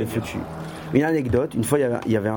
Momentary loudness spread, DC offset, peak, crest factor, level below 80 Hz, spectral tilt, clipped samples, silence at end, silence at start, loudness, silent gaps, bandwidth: 11 LU; under 0.1%; -4 dBFS; 18 dB; -48 dBFS; -6.5 dB/octave; under 0.1%; 0 s; 0 s; -23 LUFS; none; 17.5 kHz